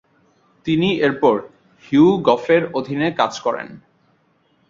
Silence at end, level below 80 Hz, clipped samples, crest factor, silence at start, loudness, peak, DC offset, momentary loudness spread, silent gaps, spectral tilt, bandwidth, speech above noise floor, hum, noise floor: 0.9 s; -58 dBFS; under 0.1%; 18 dB; 0.65 s; -18 LUFS; -2 dBFS; under 0.1%; 10 LU; none; -6.5 dB/octave; 7.4 kHz; 44 dB; none; -61 dBFS